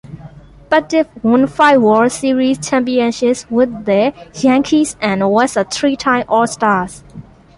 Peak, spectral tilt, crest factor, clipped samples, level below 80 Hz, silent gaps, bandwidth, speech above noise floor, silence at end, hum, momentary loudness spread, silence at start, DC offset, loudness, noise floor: 0 dBFS; -4.5 dB/octave; 14 dB; under 0.1%; -48 dBFS; none; 11.5 kHz; 24 dB; 0.35 s; none; 6 LU; 0.05 s; under 0.1%; -14 LUFS; -37 dBFS